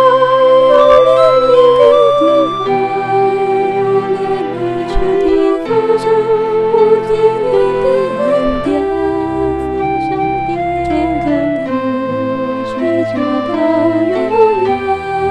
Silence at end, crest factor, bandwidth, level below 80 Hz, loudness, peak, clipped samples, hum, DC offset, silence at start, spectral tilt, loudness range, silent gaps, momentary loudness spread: 0 s; 12 dB; 9.8 kHz; -32 dBFS; -12 LUFS; 0 dBFS; under 0.1%; none; under 0.1%; 0 s; -7 dB/octave; 6 LU; none; 9 LU